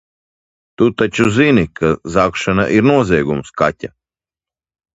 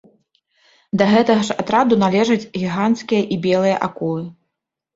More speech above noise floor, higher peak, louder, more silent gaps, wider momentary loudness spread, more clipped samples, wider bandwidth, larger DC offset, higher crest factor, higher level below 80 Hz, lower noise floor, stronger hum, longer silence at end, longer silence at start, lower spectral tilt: first, over 76 dB vs 63 dB; about the same, 0 dBFS vs -2 dBFS; first, -14 LUFS vs -18 LUFS; neither; second, 6 LU vs 10 LU; neither; first, 10.5 kHz vs 8 kHz; neither; about the same, 16 dB vs 16 dB; first, -40 dBFS vs -56 dBFS; first, under -90 dBFS vs -79 dBFS; neither; first, 1.05 s vs 0.65 s; second, 0.8 s vs 0.95 s; about the same, -6.5 dB/octave vs -6 dB/octave